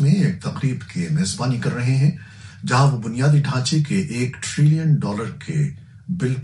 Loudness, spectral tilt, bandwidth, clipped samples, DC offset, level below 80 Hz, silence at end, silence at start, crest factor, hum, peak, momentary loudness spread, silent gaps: -20 LUFS; -6 dB/octave; 11.5 kHz; under 0.1%; under 0.1%; -54 dBFS; 0 s; 0 s; 16 dB; none; -4 dBFS; 9 LU; none